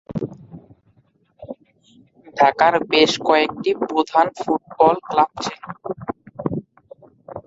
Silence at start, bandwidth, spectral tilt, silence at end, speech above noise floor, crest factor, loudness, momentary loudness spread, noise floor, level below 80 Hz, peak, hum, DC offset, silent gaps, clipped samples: 0.1 s; 7.8 kHz; -4.5 dB/octave; 0.05 s; 42 dB; 20 dB; -19 LUFS; 19 LU; -60 dBFS; -58 dBFS; -2 dBFS; none; under 0.1%; none; under 0.1%